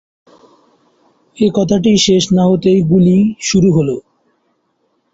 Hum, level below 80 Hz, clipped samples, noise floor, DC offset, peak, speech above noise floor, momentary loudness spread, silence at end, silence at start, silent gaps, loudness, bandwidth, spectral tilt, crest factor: none; -46 dBFS; under 0.1%; -63 dBFS; under 0.1%; -2 dBFS; 52 dB; 5 LU; 1.15 s; 1.4 s; none; -12 LUFS; 8 kHz; -6 dB/octave; 12 dB